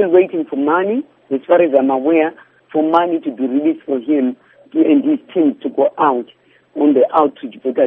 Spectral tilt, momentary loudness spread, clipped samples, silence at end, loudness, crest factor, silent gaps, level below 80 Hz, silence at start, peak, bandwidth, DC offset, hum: -5 dB/octave; 10 LU; under 0.1%; 0 s; -16 LUFS; 16 dB; none; -68 dBFS; 0 s; 0 dBFS; 3.8 kHz; under 0.1%; none